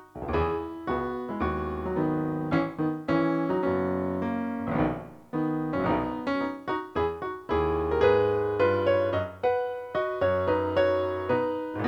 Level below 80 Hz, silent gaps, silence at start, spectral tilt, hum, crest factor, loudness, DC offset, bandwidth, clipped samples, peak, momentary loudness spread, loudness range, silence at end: -46 dBFS; none; 0 s; -8.5 dB/octave; none; 16 dB; -28 LUFS; under 0.1%; 7.6 kHz; under 0.1%; -10 dBFS; 7 LU; 4 LU; 0 s